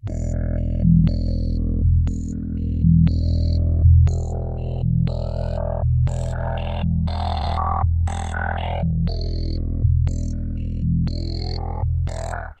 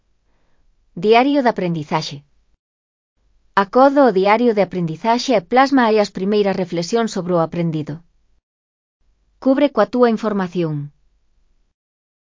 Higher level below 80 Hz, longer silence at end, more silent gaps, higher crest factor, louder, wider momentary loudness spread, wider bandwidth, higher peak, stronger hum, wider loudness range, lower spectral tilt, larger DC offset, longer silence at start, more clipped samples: first, -24 dBFS vs -58 dBFS; second, 0.05 s vs 1.45 s; second, none vs 2.59-3.16 s, 8.43-9.00 s; about the same, 16 dB vs 18 dB; second, -22 LUFS vs -17 LUFS; about the same, 10 LU vs 10 LU; first, 8.6 kHz vs 7.6 kHz; second, -4 dBFS vs 0 dBFS; neither; about the same, 4 LU vs 5 LU; first, -8 dB/octave vs -6 dB/octave; neither; second, 0.05 s vs 0.95 s; neither